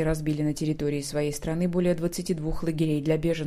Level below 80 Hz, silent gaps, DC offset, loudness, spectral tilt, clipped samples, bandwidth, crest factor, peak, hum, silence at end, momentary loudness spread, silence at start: -42 dBFS; none; under 0.1%; -27 LUFS; -6.5 dB/octave; under 0.1%; 15.5 kHz; 16 dB; -10 dBFS; none; 0 s; 4 LU; 0 s